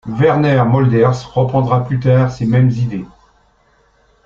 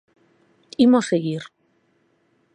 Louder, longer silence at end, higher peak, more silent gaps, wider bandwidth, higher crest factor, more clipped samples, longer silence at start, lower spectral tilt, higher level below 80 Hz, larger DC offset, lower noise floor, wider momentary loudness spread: first, -14 LUFS vs -20 LUFS; about the same, 1.2 s vs 1.1 s; first, -2 dBFS vs -6 dBFS; neither; second, 7.2 kHz vs 9.6 kHz; about the same, 14 dB vs 18 dB; neither; second, 0.05 s vs 0.8 s; first, -8.5 dB/octave vs -6 dB/octave; first, -46 dBFS vs -66 dBFS; neither; second, -55 dBFS vs -65 dBFS; second, 6 LU vs 20 LU